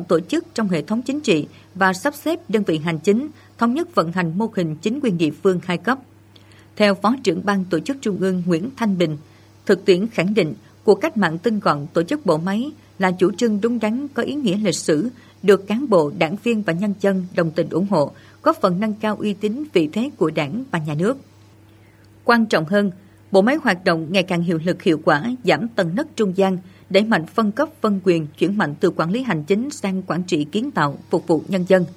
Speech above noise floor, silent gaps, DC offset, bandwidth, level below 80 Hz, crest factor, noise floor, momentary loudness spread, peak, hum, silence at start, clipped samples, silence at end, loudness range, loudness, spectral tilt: 29 dB; none; under 0.1%; 14.5 kHz; -64 dBFS; 18 dB; -48 dBFS; 6 LU; -2 dBFS; none; 0 s; under 0.1%; 0 s; 2 LU; -20 LUFS; -6 dB/octave